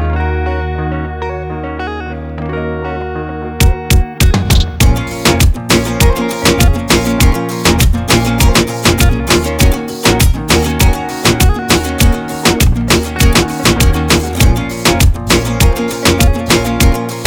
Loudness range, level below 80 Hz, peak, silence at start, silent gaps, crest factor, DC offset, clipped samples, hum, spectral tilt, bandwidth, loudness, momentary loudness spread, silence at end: 5 LU; -16 dBFS; 0 dBFS; 0 s; none; 10 dB; under 0.1%; under 0.1%; none; -4.5 dB/octave; over 20 kHz; -12 LUFS; 10 LU; 0 s